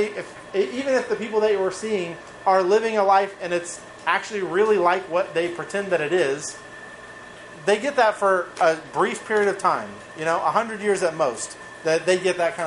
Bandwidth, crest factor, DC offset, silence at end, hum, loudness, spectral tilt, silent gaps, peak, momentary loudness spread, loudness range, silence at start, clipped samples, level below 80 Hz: 11.5 kHz; 18 dB; under 0.1%; 0 s; none; -22 LUFS; -4 dB/octave; none; -4 dBFS; 14 LU; 2 LU; 0 s; under 0.1%; -64 dBFS